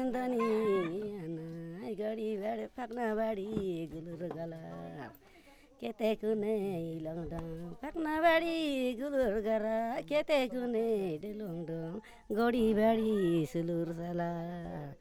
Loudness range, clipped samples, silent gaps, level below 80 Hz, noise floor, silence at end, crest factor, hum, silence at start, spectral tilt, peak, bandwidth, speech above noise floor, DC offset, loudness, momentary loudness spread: 6 LU; under 0.1%; none; -58 dBFS; -59 dBFS; 0.05 s; 18 dB; none; 0 s; -7 dB/octave; -16 dBFS; 18 kHz; 26 dB; under 0.1%; -34 LUFS; 14 LU